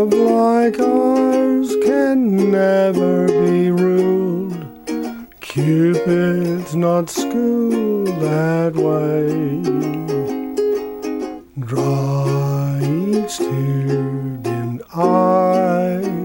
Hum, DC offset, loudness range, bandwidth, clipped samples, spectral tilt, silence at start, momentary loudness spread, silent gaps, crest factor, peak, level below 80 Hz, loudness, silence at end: none; under 0.1%; 5 LU; 17 kHz; under 0.1%; -7.5 dB/octave; 0 s; 10 LU; none; 14 dB; -2 dBFS; -54 dBFS; -17 LUFS; 0 s